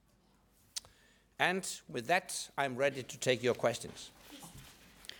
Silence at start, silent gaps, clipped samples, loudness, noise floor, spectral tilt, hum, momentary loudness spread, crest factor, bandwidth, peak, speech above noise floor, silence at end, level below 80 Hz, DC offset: 0.75 s; none; under 0.1%; -35 LUFS; -69 dBFS; -3 dB/octave; none; 19 LU; 26 dB; over 20 kHz; -12 dBFS; 34 dB; 0 s; -70 dBFS; under 0.1%